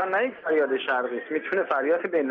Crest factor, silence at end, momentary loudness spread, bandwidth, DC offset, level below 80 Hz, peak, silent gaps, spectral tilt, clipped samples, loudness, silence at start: 14 dB; 0 s; 4 LU; 5 kHz; under 0.1%; -76 dBFS; -12 dBFS; none; -1.5 dB/octave; under 0.1%; -25 LUFS; 0 s